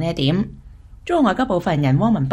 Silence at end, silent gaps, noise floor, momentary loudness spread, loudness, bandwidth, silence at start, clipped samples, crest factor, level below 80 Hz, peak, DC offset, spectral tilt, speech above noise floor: 0 s; none; -40 dBFS; 8 LU; -19 LUFS; 11 kHz; 0 s; under 0.1%; 14 dB; -42 dBFS; -4 dBFS; under 0.1%; -7.5 dB/octave; 22 dB